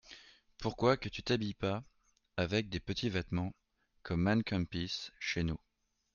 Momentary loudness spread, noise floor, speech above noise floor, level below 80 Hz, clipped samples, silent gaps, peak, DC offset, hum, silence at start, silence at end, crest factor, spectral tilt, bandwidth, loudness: 12 LU; -58 dBFS; 23 dB; -56 dBFS; under 0.1%; none; -14 dBFS; under 0.1%; none; 0.05 s; 0.6 s; 22 dB; -6 dB/octave; 7.2 kHz; -36 LUFS